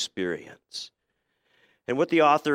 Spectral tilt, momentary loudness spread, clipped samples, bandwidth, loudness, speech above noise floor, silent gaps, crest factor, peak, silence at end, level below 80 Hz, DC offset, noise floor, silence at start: -4.5 dB/octave; 20 LU; under 0.1%; 14.5 kHz; -25 LUFS; 52 dB; none; 18 dB; -8 dBFS; 0 s; -74 dBFS; under 0.1%; -77 dBFS; 0 s